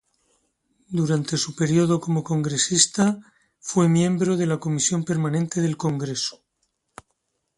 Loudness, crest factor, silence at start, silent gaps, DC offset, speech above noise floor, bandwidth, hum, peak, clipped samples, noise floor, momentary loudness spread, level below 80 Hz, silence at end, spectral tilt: -22 LUFS; 20 dB; 0.9 s; none; under 0.1%; 53 dB; 11.5 kHz; none; -4 dBFS; under 0.1%; -75 dBFS; 8 LU; -62 dBFS; 1.25 s; -4.5 dB/octave